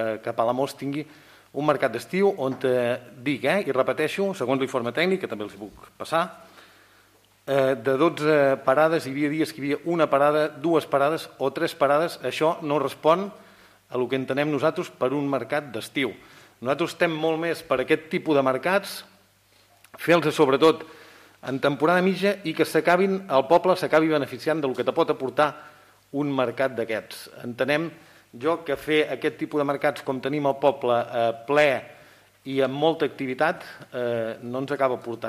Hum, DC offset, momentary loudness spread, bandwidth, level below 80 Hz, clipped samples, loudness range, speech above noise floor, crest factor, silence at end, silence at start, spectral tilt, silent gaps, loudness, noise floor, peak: none; under 0.1%; 11 LU; 15.5 kHz; -68 dBFS; under 0.1%; 5 LU; 36 dB; 18 dB; 0 s; 0 s; -5.5 dB/octave; none; -24 LUFS; -59 dBFS; -6 dBFS